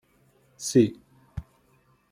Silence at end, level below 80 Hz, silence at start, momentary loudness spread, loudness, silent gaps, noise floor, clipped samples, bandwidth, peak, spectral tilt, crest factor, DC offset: 0.7 s; -54 dBFS; 0.6 s; 20 LU; -24 LUFS; none; -64 dBFS; under 0.1%; 15.5 kHz; -8 dBFS; -6 dB/octave; 20 dB; under 0.1%